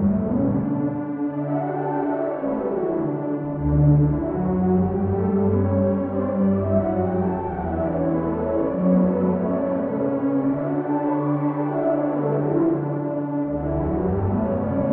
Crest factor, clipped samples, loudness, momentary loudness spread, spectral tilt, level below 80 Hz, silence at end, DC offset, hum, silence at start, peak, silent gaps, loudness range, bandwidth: 14 dB; under 0.1%; -22 LUFS; 6 LU; -11.5 dB/octave; -40 dBFS; 0 s; under 0.1%; none; 0 s; -8 dBFS; none; 2 LU; 3.1 kHz